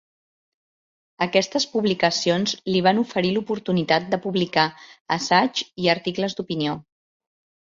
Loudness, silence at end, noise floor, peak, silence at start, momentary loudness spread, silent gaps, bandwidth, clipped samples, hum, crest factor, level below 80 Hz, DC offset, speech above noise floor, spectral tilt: -22 LUFS; 0.95 s; under -90 dBFS; -4 dBFS; 1.2 s; 7 LU; 5.01-5.05 s; 7.6 kHz; under 0.1%; none; 20 dB; -62 dBFS; under 0.1%; over 68 dB; -4.5 dB/octave